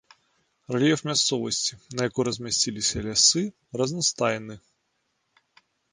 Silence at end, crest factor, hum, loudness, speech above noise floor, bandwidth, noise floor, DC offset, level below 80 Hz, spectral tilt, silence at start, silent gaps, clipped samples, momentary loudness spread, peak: 1.35 s; 22 dB; none; -24 LUFS; 49 dB; 10.5 kHz; -74 dBFS; under 0.1%; -56 dBFS; -2.5 dB/octave; 0.7 s; none; under 0.1%; 11 LU; -6 dBFS